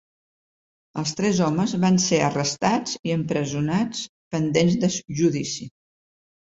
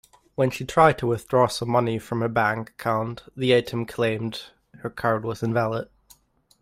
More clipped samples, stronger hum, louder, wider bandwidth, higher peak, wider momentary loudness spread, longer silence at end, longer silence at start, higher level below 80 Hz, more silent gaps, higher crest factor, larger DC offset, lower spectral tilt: neither; neither; about the same, -23 LUFS vs -24 LUFS; second, 8 kHz vs 15.5 kHz; second, -6 dBFS vs -2 dBFS; second, 10 LU vs 14 LU; about the same, 0.8 s vs 0.8 s; first, 0.95 s vs 0.4 s; about the same, -58 dBFS vs -54 dBFS; first, 2.99-3.04 s, 4.09-4.31 s vs none; about the same, 18 dB vs 22 dB; neither; about the same, -5 dB/octave vs -6 dB/octave